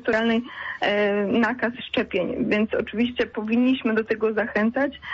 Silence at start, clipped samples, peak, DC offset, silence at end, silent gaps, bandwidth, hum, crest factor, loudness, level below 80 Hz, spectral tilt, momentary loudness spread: 0 s; under 0.1%; -10 dBFS; under 0.1%; 0 s; none; 7.4 kHz; none; 12 dB; -23 LUFS; -56 dBFS; -6.5 dB/octave; 5 LU